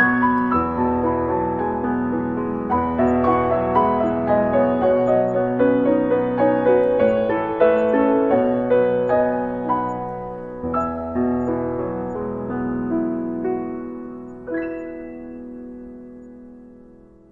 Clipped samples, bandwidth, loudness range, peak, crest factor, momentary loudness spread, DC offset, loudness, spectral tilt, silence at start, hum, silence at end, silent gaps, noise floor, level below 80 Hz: under 0.1%; 4.3 kHz; 10 LU; -4 dBFS; 16 dB; 16 LU; under 0.1%; -20 LUFS; -9.5 dB/octave; 0 s; none; 0.45 s; none; -47 dBFS; -48 dBFS